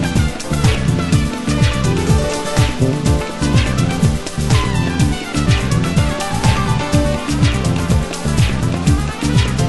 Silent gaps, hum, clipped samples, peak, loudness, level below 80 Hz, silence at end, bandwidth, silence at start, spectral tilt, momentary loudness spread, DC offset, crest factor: none; none; under 0.1%; 0 dBFS; -16 LUFS; -24 dBFS; 0 s; 12.5 kHz; 0 s; -5.5 dB/octave; 3 LU; under 0.1%; 14 dB